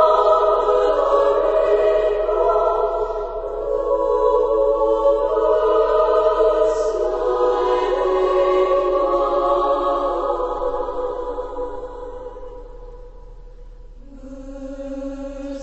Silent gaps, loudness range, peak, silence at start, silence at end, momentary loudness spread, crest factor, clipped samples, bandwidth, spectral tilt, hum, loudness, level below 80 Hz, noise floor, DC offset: none; 17 LU; -2 dBFS; 0 s; 0 s; 16 LU; 16 dB; under 0.1%; 8.2 kHz; -5.5 dB/octave; none; -18 LUFS; -38 dBFS; -39 dBFS; 0.3%